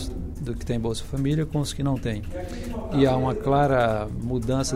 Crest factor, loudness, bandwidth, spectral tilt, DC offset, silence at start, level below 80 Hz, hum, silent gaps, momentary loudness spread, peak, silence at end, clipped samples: 18 dB; -25 LUFS; 15.5 kHz; -6.5 dB/octave; under 0.1%; 0 s; -36 dBFS; none; none; 12 LU; -8 dBFS; 0 s; under 0.1%